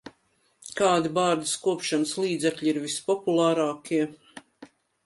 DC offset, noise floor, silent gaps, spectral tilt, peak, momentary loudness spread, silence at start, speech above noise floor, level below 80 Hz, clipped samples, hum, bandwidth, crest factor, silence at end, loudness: under 0.1%; -68 dBFS; none; -4 dB/octave; -10 dBFS; 7 LU; 0.05 s; 43 dB; -70 dBFS; under 0.1%; none; 11.5 kHz; 18 dB; 0.4 s; -25 LUFS